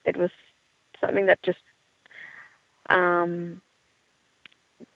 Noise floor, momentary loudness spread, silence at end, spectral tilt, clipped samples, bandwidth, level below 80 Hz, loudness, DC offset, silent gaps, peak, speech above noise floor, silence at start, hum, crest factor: -67 dBFS; 23 LU; 0.1 s; -7.5 dB/octave; under 0.1%; 7.2 kHz; -74 dBFS; -24 LUFS; under 0.1%; none; -4 dBFS; 44 dB; 0.05 s; none; 24 dB